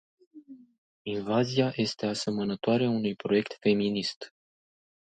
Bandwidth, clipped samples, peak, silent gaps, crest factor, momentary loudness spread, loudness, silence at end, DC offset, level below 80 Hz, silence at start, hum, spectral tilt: 9.2 kHz; under 0.1%; -12 dBFS; 0.78-1.05 s, 4.16-4.21 s; 18 dB; 9 LU; -28 LUFS; 0.8 s; under 0.1%; -68 dBFS; 0.35 s; none; -6 dB/octave